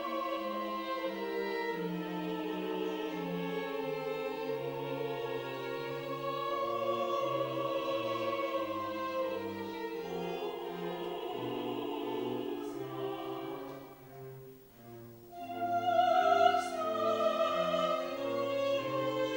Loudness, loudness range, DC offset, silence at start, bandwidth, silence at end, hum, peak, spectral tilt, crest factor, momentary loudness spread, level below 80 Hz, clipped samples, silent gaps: -35 LUFS; 8 LU; under 0.1%; 0 s; 16 kHz; 0 s; none; -14 dBFS; -5.5 dB/octave; 22 dB; 11 LU; -72 dBFS; under 0.1%; none